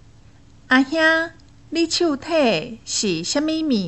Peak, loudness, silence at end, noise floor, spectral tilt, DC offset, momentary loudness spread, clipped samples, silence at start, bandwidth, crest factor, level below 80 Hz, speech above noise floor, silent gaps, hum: -4 dBFS; -20 LUFS; 0 s; -49 dBFS; -3 dB/octave; 0.3%; 8 LU; under 0.1%; 0.7 s; 8.4 kHz; 18 dB; -54 dBFS; 29 dB; none; none